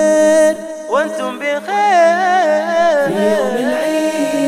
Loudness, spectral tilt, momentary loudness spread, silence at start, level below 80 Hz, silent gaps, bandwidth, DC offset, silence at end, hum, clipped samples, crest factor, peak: -14 LUFS; -4 dB/octave; 8 LU; 0 s; -62 dBFS; none; 15 kHz; under 0.1%; 0 s; none; under 0.1%; 12 dB; 0 dBFS